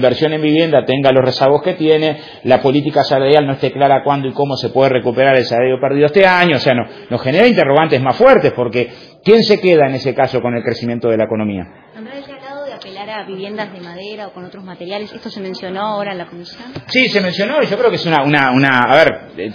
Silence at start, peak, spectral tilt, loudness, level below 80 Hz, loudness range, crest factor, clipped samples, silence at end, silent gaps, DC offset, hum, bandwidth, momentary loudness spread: 0 s; 0 dBFS; -7 dB/octave; -13 LUFS; -52 dBFS; 13 LU; 14 dB; 0.1%; 0 s; none; under 0.1%; none; 5.4 kHz; 18 LU